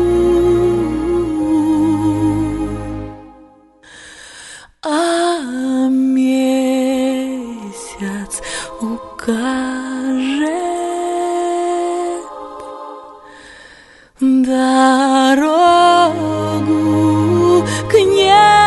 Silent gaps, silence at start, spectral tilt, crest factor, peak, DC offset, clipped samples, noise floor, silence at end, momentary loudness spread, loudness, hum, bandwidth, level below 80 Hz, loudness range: none; 0 s; -5 dB/octave; 14 dB; 0 dBFS; under 0.1%; under 0.1%; -45 dBFS; 0 s; 17 LU; -15 LUFS; none; 12 kHz; -40 dBFS; 9 LU